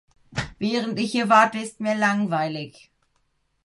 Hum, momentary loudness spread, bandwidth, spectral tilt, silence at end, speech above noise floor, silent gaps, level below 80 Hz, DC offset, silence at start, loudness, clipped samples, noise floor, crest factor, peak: none; 15 LU; 11.5 kHz; -5 dB/octave; 0.95 s; 47 dB; none; -54 dBFS; under 0.1%; 0.3 s; -22 LUFS; under 0.1%; -69 dBFS; 20 dB; -4 dBFS